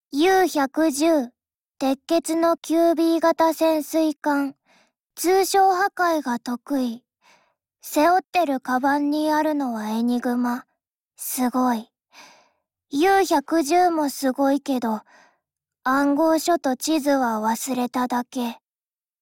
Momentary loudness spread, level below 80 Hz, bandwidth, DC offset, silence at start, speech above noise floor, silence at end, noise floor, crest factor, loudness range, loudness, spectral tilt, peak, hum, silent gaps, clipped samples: 9 LU; -64 dBFS; 17 kHz; under 0.1%; 0.15 s; over 69 dB; 0.65 s; under -90 dBFS; 14 dB; 3 LU; -22 LUFS; -3 dB/octave; -8 dBFS; none; 1.55-1.59 s, 8.29-8.33 s; under 0.1%